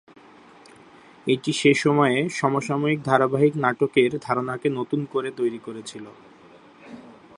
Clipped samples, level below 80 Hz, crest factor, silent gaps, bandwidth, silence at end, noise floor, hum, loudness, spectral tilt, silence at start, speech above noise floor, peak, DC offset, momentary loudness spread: under 0.1%; -68 dBFS; 22 dB; none; 11.5 kHz; 0.25 s; -50 dBFS; none; -22 LUFS; -5.5 dB/octave; 1.25 s; 27 dB; -2 dBFS; under 0.1%; 17 LU